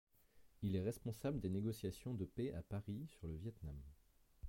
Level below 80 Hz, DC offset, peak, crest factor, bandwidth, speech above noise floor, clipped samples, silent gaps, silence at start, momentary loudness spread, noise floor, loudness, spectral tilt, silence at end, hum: -60 dBFS; under 0.1%; -28 dBFS; 18 dB; 16.5 kHz; 25 dB; under 0.1%; none; 0.35 s; 10 LU; -70 dBFS; -46 LUFS; -7.5 dB/octave; 0 s; none